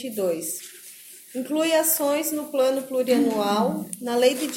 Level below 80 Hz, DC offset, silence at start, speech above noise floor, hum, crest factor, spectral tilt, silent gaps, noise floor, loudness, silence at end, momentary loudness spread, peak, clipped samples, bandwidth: -74 dBFS; under 0.1%; 0 s; 22 dB; none; 18 dB; -3.5 dB/octave; none; -45 dBFS; -23 LUFS; 0 s; 15 LU; -6 dBFS; under 0.1%; 17 kHz